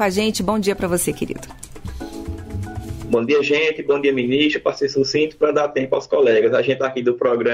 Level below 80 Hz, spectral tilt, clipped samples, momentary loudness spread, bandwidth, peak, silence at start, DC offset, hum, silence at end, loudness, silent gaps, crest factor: -42 dBFS; -4.5 dB/octave; under 0.1%; 16 LU; 16 kHz; -4 dBFS; 0 s; under 0.1%; none; 0 s; -19 LUFS; none; 14 dB